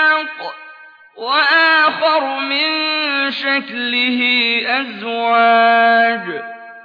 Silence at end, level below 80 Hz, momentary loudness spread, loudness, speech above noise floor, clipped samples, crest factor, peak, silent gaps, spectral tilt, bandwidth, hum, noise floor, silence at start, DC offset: 0 s; -88 dBFS; 15 LU; -14 LUFS; 26 dB; under 0.1%; 12 dB; -4 dBFS; none; -4.5 dB/octave; 5.2 kHz; none; -41 dBFS; 0 s; under 0.1%